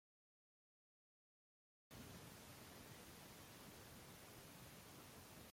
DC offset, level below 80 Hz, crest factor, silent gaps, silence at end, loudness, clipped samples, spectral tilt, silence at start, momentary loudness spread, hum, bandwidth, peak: under 0.1%; -78 dBFS; 16 dB; none; 0 s; -59 LUFS; under 0.1%; -3.5 dB/octave; 1.9 s; 1 LU; none; 16.5 kHz; -46 dBFS